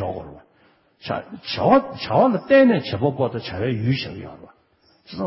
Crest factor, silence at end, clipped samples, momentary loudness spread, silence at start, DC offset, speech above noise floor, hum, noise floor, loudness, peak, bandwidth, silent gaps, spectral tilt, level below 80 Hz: 18 dB; 0 s; under 0.1%; 22 LU; 0 s; under 0.1%; 39 dB; none; -59 dBFS; -20 LUFS; -4 dBFS; 5.8 kHz; none; -10.5 dB/octave; -50 dBFS